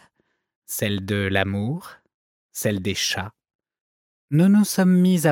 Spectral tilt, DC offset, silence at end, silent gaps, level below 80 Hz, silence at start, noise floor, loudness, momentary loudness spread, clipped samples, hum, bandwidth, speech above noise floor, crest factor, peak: -5.5 dB/octave; under 0.1%; 0 s; 2.14-2.49 s, 3.55-3.59 s, 3.81-4.28 s; -62 dBFS; 0.7 s; -69 dBFS; -21 LUFS; 13 LU; under 0.1%; none; 17.5 kHz; 49 dB; 20 dB; -2 dBFS